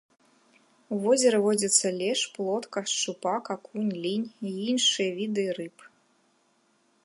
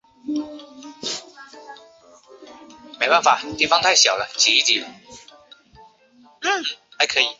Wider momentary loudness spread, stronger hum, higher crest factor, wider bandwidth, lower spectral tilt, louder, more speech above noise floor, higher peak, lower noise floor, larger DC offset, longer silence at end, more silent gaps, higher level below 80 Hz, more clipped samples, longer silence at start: second, 11 LU vs 20 LU; neither; about the same, 20 dB vs 22 dB; first, 11.5 kHz vs 8 kHz; first, -2.5 dB/octave vs 0 dB/octave; second, -27 LUFS vs -18 LUFS; first, 41 dB vs 34 dB; second, -8 dBFS vs -2 dBFS; first, -68 dBFS vs -53 dBFS; neither; first, 1.2 s vs 0.05 s; neither; second, -80 dBFS vs -62 dBFS; neither; first, 0.9 s vs 0.25 s